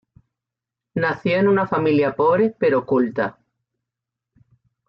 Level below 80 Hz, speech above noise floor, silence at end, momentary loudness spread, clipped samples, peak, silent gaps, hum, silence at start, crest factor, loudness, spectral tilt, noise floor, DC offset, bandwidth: -62 dBFS; 68 dB; 1.55 s; 7 LU; under 0.1%; -8 dBFS; none; none; 0.95 s; 14 dB; -20 LUFS; -9 dB/octave; -86 dBFS; under 0.1%; 5.8 kHz